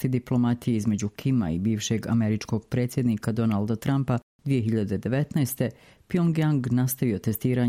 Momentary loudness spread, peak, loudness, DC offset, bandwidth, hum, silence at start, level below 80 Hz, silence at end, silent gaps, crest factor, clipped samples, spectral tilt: 4 LU; -10 dBFS; -26 LUFS; under 0.1%; 16 kHz; none; 0 s; -54 dBFS; 0 s; 4.23-4.39 s; 14 dB; under 0.1%; -7 dB/octave